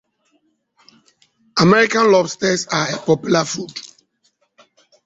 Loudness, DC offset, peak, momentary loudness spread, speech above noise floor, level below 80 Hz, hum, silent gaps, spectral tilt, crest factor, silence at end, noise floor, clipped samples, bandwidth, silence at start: -16 LUFS; under 0.1%; -2 dBFS; 13 LU; 49 dB; -58 dBFS; none; none; -4.5 dB/octave; 18 dB; 1.2 s; -64 dBFS; under 0.1%; 8 kHz; 1.55 s